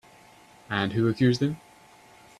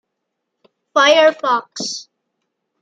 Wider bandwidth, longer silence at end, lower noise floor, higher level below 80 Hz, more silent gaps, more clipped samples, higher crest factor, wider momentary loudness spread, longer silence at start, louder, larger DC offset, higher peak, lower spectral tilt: first, 13 kHz vs 9.2 kHz; about the same, 0.85 s vs 0.8 s; second, -54 dBFS vs -76 dBFS; first, -60 dBFS vs -76 dBFS; neither; neither; about the same, 20 dB vs 18 dB; second, 9 LU vs 14 LU; second, 0.7 s vs 0.95 s; second, -26 LUFS vs -15 LUFS; neither; second, -8 dBFS vs -2 dBFS; first, -7 dB/octave vs -1 dB/octave